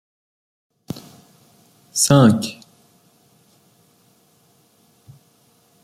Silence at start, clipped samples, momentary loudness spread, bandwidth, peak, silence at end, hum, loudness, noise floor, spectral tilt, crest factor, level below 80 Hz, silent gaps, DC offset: 0.95 s; under 0.1%; 23 LU; 16 kHz; -2 dBFS; 3.3 s; none; -16 LUFS; -58 dBFS; -5 dB/octave; 22 dB; -58 dBFS; none; under 0.1%